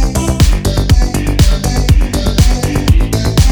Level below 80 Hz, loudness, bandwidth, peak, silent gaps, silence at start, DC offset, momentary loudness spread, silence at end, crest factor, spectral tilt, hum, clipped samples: -12 dBFS; -12 LUFS; over 20 kHz; 0 dBFS; none; 0 s; under 0.1%; 2 LU; 0 s; 10 dB; -5.5 dB/octave; none; 0.3%